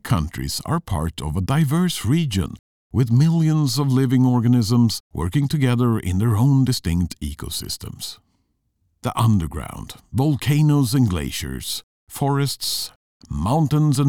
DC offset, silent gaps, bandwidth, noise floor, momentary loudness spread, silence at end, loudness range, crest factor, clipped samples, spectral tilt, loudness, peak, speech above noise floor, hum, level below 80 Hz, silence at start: 0.3%; 2.59-2.90 s, 5.00-5.10 s, 11.83-12.07 s, 12.96-13.20 s; 18.5 kHz; -69 dBFS; 13 LU; 0 s; 5 LU; 12 dB; under 0.1%; -6 dB/octave; -20 LUFS; -8 dBFS; 49 dB; none; -38 dBFS; 0.05 s